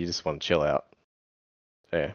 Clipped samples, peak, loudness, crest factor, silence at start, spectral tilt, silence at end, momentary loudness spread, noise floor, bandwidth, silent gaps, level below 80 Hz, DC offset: under 0.1%; -8 dBFS; -28 LUFS; 22 dB; 0 s; -4.5 dB/octave; 0 s; 7 LU; under -90 dBFS; 7.2 kHz; 1.04-1.84 s; -56 dBFS; under 0.1%